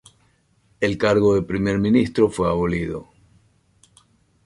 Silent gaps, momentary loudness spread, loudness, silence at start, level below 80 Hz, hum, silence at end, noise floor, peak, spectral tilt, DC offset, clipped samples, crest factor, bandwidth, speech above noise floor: none; 8 LU; -20 LUFS; 0.8 s; -44 dBFS; none; 1.45 s; -61 dBFS; -4 dBFS; -7 dB/octave; under 0.1%; under 0.1%; 18 dB; 11.5 kHz; 42 dB